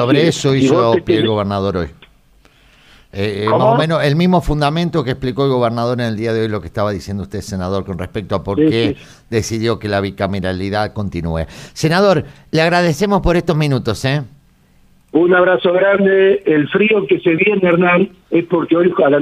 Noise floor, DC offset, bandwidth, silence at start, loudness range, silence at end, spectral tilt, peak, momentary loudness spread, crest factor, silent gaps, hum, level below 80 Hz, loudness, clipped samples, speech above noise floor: -50 dBFS; under 0.1%; 15 kHz; 0 s; 6 LU; 0 s; -6.5 dB/octave; -2 dBFS; 10 LU; 14 dB; none; none; -36 dBFS; -15 LUFS; under 0.1%; 36 dB